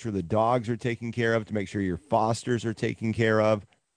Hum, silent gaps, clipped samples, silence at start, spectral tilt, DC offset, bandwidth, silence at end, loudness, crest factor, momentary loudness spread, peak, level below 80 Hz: none; none; under 0.1%; 0 s; -6.5 dB/octave; under 0.1%; 10 kHz; 0.35 s; -27 LUFS; 16 dB; 7 LU; -10 dBFS; -58 dBFS